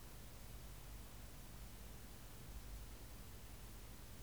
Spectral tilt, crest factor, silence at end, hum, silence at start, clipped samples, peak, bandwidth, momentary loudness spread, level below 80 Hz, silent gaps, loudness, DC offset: -4 dB/octave; 14 dB; 0 s; 50 Hz at -60 dBFS; 0 s; under 0.1%; -40 dBFS; over 20 kHz; 1 LU; -58 dBFS; none; -56 LUFS; 0.1%